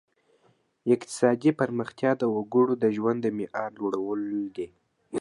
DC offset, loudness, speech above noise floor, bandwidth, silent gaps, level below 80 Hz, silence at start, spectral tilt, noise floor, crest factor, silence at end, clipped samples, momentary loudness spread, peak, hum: under 0.1%; -27 LUFS; 40 dB; 11.5 kHz; none; -72 dBFS; 0.85 s; -6.5 dB/octave; -66 dBFS; 20 dB; 0 s; under 0.1%; 11 LU; -8 dBFS; none